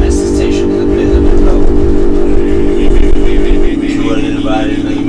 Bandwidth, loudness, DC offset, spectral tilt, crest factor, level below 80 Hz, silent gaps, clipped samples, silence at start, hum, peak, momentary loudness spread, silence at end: 9.8 kHz; -12 LUFS; under 0.1%; -7 dB/octave; 8 dB; -10 dBFS; none; 5%; 0 s; none; 0 dBFS; 3 LU; 0 s